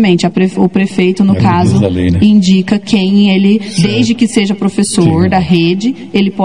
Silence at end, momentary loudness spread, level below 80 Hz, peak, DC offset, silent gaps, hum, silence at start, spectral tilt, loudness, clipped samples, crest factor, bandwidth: 0 s; 4 LU; -42 dBFS; 0 dBFS; 1%; none; none; 0 s; -6 dB/octave; -10 LUFS; 0.4%; 10 dB; 11 kHz